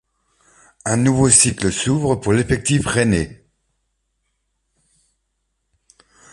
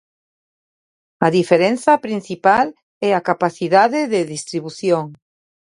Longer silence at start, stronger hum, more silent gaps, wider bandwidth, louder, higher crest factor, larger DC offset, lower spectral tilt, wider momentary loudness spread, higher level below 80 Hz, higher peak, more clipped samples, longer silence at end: second, 0.85 s vs 1.2 s; neither; second, none vs 2.83-3.01 s; about the same, 11.5 kHz vs 11.5 kHz; about the same, -16 LUFS vs -17 LUFS; about the same, 20 dB vs 18 dB; neither; second, -4 dB/octave vs -5.5 dB/octave; about the same, 10 LU vs 9 LU; first, -40 dBFS vs -62 dBFS; about the same, 0 dBFS vs 0 dBFS; neither; first, 3 s vs 0.45 s